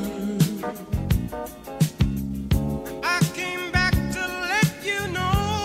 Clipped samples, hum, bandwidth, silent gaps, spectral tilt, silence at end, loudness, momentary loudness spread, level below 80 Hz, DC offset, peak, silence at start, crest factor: under 0.1%; none; 16 kHz; none; -5 dB/octave; 0 s; -24 LUFS; 8 LU; -34 dBFS; under 0.1%; -6 dBFS; 0 s; 18 dB